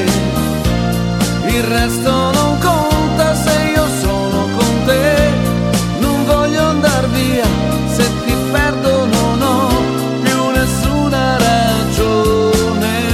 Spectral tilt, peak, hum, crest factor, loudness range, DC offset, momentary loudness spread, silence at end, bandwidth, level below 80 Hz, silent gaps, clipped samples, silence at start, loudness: -5 dB/octave; 0 dBFS; none; 12 dB; 1 LU; under 0.1%; 3 LU; 0 s; 17 kHz; -26 dBFS; none; under 0.1%; 0 s; -14 LUFS